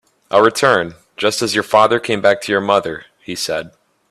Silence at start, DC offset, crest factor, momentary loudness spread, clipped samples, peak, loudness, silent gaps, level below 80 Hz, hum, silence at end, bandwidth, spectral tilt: 0.3 s; under 0.1%; 16 dB; 13 LU; under 0.1%; 0 dBFS; -15 LUFS; none; -58 dBFS; none; 0.4 s; 14 kHz; -3.5 dB/octave